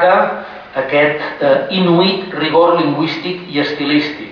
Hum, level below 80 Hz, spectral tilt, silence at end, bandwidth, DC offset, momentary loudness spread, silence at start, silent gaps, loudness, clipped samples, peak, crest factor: none; -56 dBFS; -7.5 dB/octave; 0 s; 5.4 kHz; under 0.1%; 9 LU; 0 s; none; -14 LUFS; under 0.1%; -2 dBFS; 14 dB